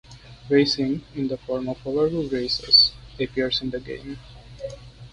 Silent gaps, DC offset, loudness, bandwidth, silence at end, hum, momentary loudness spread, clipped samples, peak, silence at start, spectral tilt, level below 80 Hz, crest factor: none; under 0.1%; -21 LUFS; 10.5 kHz; 0.05 s; 50 Hz at -50 dBFS; 22 LU; under 0.1%; -4 dBFS; 0.1 s; -5 dB/octave; -48 dBFS; 20 dB